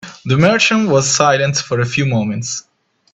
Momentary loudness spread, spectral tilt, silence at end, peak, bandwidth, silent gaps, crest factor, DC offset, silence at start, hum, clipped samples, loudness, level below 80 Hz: 10 LU; -4 dB/octave; 0.55 s; 0 dBFS; 8.4 kHz; none; 16 dB; under 0.1%; 0.05 s; none; under 0.1%; -14 LUFS; -50 dBFS